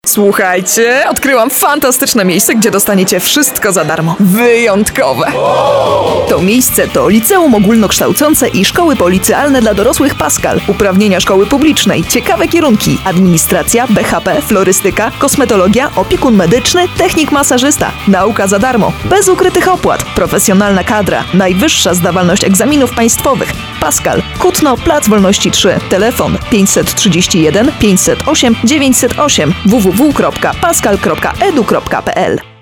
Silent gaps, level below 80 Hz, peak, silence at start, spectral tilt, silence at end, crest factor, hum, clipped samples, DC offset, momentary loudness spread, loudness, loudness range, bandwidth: none; -30 dBFS; 0 dBFS; 0.05 s; -4 dB/octave; 0.15 s; 8 dB; none; 0.2%; under 0.1%; 4 LU; -9 LUFS; 1 LU; 19.5 kHz